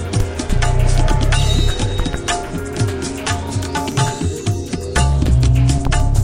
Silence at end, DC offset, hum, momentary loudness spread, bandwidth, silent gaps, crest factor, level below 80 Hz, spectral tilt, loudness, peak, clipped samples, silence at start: 0 s; under 0.1%; none; 7 LU; 15 kHz; none; 14 dB; -18 dBFS; -5 dB/octave; -18 LUFS; -2 dBFS; under 0.1%; 0 s